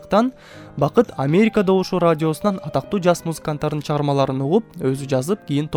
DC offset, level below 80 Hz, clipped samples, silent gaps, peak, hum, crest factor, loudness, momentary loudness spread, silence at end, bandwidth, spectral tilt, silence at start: under 0.1%; -50 dBFS; under 0.1%; none; 0 dBFS; none; 18 dB; -20 LUFS; 7 LU; 0 s; 18 kHz; -7 dB/octave; 0 s